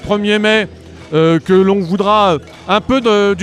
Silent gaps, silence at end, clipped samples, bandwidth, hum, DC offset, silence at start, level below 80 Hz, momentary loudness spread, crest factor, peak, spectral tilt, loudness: none; 0 s; under 0.1%; 11.5 kHz; none; under 0.1%; 0 s; -42 dBFS; 5 LU; 12 dB; 0 dBFS; -6 dB/octave; -13 LUFS